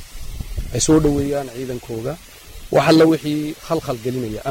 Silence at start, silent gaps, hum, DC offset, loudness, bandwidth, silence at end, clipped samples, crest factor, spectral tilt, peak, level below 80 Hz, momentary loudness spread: 0 s; none; none; under 0.1%; -19 LUFS; 16.5 kHz; 0 s; under 0.1%; 16 dB; -5 dB/octave; -4 dBFS; -34 dBFS; 20 LU